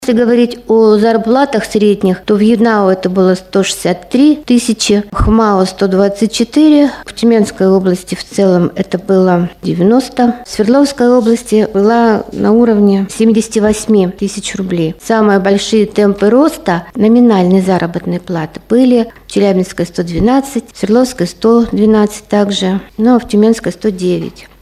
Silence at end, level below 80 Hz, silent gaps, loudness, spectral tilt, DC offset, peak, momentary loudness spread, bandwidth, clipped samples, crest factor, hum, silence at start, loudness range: 0.2 s; -34 dBFS; none; -11 LUFS; -6 dB/octave; under 0.1%; 0 dBFS; 7 LU; 14.5 kHz; under 0.1%; 10 dB; none; 0 s; 2 LU